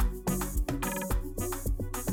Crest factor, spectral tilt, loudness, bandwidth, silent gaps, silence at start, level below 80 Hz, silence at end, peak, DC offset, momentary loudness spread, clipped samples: 12 dB; -5 dB/octave; -33 LUFS; 19 kHz; none; 0 s; -34 dBFS; 0 s; -18 dBFS; under 0.1%; 3 LU; under 0.1%